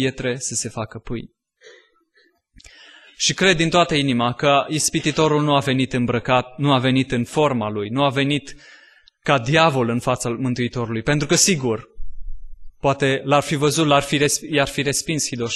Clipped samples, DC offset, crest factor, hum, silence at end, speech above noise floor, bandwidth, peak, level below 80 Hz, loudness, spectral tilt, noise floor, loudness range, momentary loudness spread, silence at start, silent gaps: under 0.1%; under 0.1%; 18 dB; none; 0 s; 41 dB; 12.5 kHz; -2 dBFS; -42 dBFS; -19 LUFS; -4 dB/octave; -61 dBFS; 3 LU; 8 LU; 0 s; none